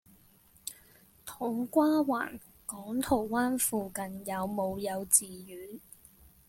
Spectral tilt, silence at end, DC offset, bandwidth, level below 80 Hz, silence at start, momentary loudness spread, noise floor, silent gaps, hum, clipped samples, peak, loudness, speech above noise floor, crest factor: -3.5 dB/octave; 0.7 s; under 0.1%; 17 kHz; -64 dBFS; 0.65 s; 20 LU; -62 dBFS; none; none; under 0.1%; -6 dBFS; -30 LUFS; 31 dB; 28 dB